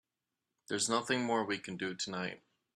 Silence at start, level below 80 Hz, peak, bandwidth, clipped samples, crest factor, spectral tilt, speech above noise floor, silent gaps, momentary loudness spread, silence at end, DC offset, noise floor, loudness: 0.7 s; -78 dBFS; -16 dBFS; 13 kHz; under 0.1%; 22 dB; -3 dB/octave; 53 dB; none; 8 LU; 0.4 s; under 0.1%; -89 dBFS; -35 LUFS